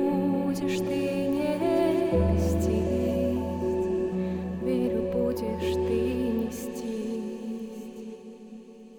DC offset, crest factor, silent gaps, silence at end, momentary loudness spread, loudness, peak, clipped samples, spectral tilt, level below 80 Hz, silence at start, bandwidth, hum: under 0.1%; 14 dB; none; 0 s; 15 LU; -28 LUFS; -12 dBFS; under 0.1%; -7 dB/octave; -46 dBFS; 0 s; 19 kHz; none